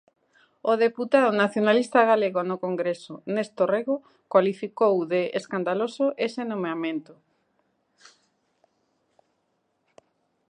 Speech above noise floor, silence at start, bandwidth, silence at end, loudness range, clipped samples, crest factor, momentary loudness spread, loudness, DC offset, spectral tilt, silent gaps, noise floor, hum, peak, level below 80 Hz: 49 dB; 0.65 s; 10 kHz; 3.5 s; 11 LU; under 0.1%; 22 dB; 10 LU; -24 LUFS; under 0.1%; -6 dB/octave; none; -73 dBFS; none; -4 dBFS; -80 dBFS